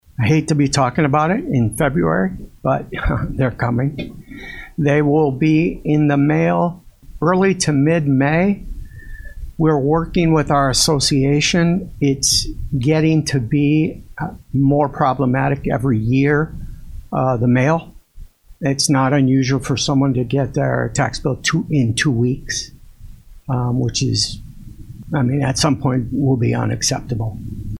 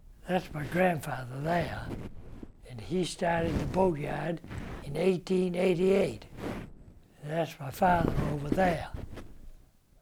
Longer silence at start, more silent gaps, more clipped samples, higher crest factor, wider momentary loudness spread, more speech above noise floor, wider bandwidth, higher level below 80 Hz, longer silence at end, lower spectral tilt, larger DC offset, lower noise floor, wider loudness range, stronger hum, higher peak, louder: first, 0.2 s vs 0.05 s; neither; neither; about the same, 16 dB vs 18 dB; second, 11 LU vs 19 LU; about the same, 23 dB vs 26 dB; second, 14 kHz vs 17.5 kHz; first, -36 dBFS vs -46 dBFS; second, 0 s vs 0.45 s; about the same, -5.5 dB/octave vs -6.5 dB/octave; neither; second, -39 dBFS vs -55 dBFS; about the same, 4 LU vs 3 LU; neither; first, -2 dBFS vs -12 dBFS; first, -17 LUFS vs -30 LUFS